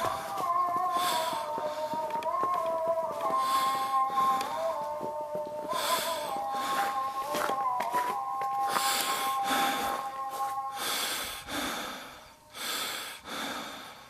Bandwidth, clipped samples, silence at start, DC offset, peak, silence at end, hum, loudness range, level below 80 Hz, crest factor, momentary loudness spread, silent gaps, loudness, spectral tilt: 15.5 kHz; under 0.1%; 0 s; under 0.1%; -10 dBFS; 0 s; none; 4 LU; -66 dBFS; 20 dB; 8 LU; none; -31 LUFS; -1.5 dB/octave